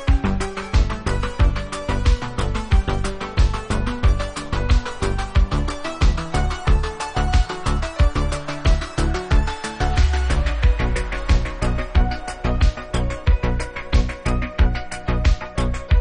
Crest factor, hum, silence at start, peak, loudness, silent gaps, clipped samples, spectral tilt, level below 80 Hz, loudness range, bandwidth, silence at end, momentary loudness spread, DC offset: 14 dB; none; 0 s; -4 dBFS; -22 LUFS; none; under 0.1%; -6 dB/octave; -20 dBFS; 1 LU; 10.5 kHz; 0 s; 5 LU; under 0.1%